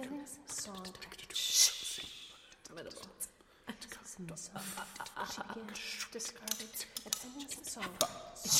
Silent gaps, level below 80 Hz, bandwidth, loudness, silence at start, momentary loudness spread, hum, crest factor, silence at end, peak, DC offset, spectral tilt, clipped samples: none; -70 dBFS; 16 kHz; -37 LUFS; 0 s; 18 LU; none; 28 dB; 0 s; -12 dBFS; under 0.1%; -0.5 dB/octave; under 0.1%